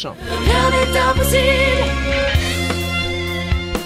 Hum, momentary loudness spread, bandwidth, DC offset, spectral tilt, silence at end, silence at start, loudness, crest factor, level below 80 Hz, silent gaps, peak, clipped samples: none; 7 LU; 16 kHz; under 0.1%; -4.5 dB/octave; 0 s; 0 s; -17 LUFS; 14 dB; -24 dBFS; none; -2 dBFS; under 0.1%